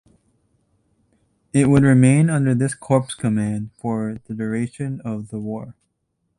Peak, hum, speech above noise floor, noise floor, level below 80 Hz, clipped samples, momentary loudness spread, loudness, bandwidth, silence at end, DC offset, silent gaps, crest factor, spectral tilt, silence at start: -2 dBFS; none; 54 dB; -72 dBFS; -52 dBFS; under 0.1%; 15 LU; -20 LUFS; 11.5 kHz; 0.65 s; under 0.1%; none; 18 dB; -7 dB/octave; 1.55 s